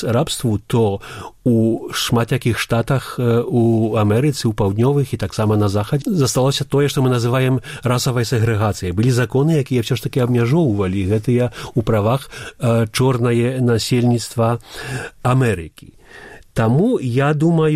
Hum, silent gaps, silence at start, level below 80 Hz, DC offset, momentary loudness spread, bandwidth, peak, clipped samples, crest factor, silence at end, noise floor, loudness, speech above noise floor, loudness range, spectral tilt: none; none; 0 s; -44 dBFS; under 0.1%; 5 LU; 15.5 kHz; -4 dBFS; under 0.1%; 12 dB; 0 s; -40 dBFS; -18 LUFS; 23 dB; 2 LU; -6.5 dB/octave